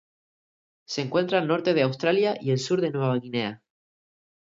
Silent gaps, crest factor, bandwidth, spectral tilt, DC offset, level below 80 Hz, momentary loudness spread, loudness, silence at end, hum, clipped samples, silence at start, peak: none; 18 dB; 7.8 kHz; -6 dB/octave; under 0.1%; -72 dBFS; 7 LU; -25 LUFS; 0.85 s; none; under 0.1%; 0.9 s; -8 dBFS